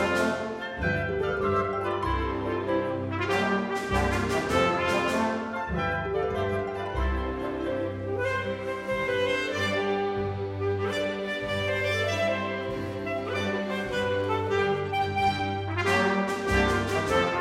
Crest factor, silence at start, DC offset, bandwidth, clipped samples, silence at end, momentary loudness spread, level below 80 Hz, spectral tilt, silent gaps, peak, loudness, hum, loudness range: 16 dB; 0 s; under 0.1%; 15.5 kHz; under 0.1%; 0 s; 6 LU; -42 dBFS; -5.5 dB/octave; none; -12 dBFS; -28 LUFS; none; 3 LU